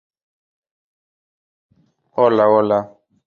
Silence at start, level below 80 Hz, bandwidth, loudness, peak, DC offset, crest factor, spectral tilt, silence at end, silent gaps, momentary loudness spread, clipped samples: 2.15 s; -64 dBFS; 6.6 kHz; -16 LUFS; -2 dBFS; under 0.1%; 20 dB; -8.5 dB/octave; 0.4 s; none; 15 LU; under 0.1%